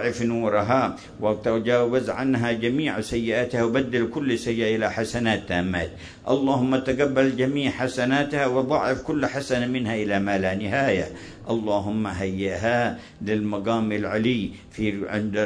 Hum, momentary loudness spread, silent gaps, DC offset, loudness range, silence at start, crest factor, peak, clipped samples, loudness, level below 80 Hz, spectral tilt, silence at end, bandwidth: none; 6 LU; none; under 0.1%; 2 LU; 0 s; 16 dB; -8 dBFS; under 0.1%; -24 LUFS; -50 dBFS; -6 dB/octave; 0 s; 11 kHz